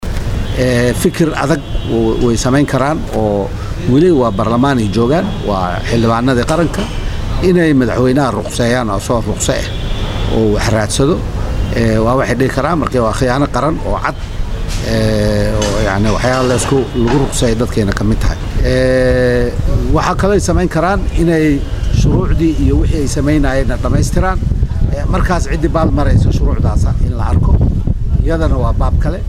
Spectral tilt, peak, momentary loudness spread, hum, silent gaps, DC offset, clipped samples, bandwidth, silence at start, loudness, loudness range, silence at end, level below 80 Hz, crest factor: -6 dB/octave; 0 dBFS; 6 LU; none; none; under 0.1%; under 0.1%; 15 kHz; 0 s; -14 LUFS; 2 LU; 0 s; -18 dBFS; 12 dB